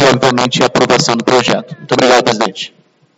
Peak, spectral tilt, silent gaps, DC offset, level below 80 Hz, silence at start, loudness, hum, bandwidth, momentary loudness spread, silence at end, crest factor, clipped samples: 0 dBFS; -4 dB/octave; none; under 0.1%; -50 dBFS; 0 s; -11 LUFS; none; 13 kHz; 9 LU; 0.5 s; 12 dB; 0.3%